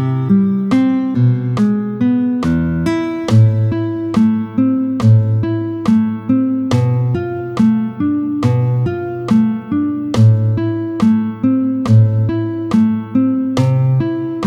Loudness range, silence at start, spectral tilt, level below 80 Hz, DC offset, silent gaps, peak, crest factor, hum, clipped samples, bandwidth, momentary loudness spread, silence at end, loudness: 2 LU; 0 s; -9 dB/octave; -44 dBFS; under 0.1%; none; -2 dBFS; 12 dB; none; under 0.1%; 8.4 kHz; 6 LU; 0 s; -15 LUFS